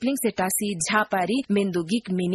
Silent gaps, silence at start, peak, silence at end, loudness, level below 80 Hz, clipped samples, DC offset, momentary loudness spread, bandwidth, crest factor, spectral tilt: none; 0 s; -6 dBFS; 0 s; -24 LUFS; -62 dBFS; under 0.1%; under 0.1%; 3 LU; 12.5 kHz; 18 dB; -4 dB/octave